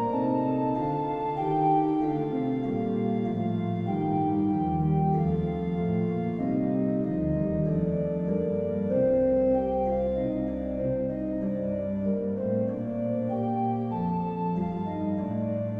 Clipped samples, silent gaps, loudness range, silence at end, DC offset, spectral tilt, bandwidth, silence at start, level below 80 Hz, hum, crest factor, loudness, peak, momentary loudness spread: under 0.1%; none; 3 LU; 0 s; under 0.1%; -11.5 dB/octave; 4.9 kHz; 0 s; -48 dBFS; none; 14 dB; -28 LUFS; -12 dBFS; 5 LU